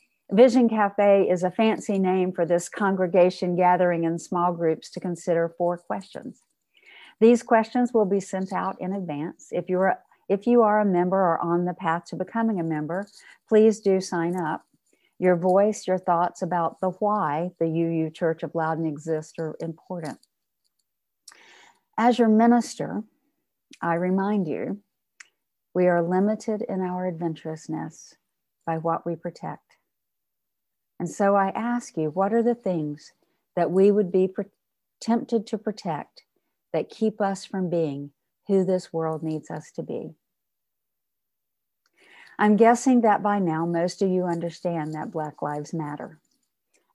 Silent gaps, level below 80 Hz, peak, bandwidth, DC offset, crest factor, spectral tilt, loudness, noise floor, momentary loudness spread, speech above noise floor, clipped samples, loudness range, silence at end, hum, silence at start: none; -74 dBFS; -6 dBFS; 12 kHz; under 0.1%; 20 dB; -7 dB/octave; -24 LUFS; -84 dBFS; 15 LU; 61 dB; under 0.1%; 7 LU; 0.8 s; none; 0.3 s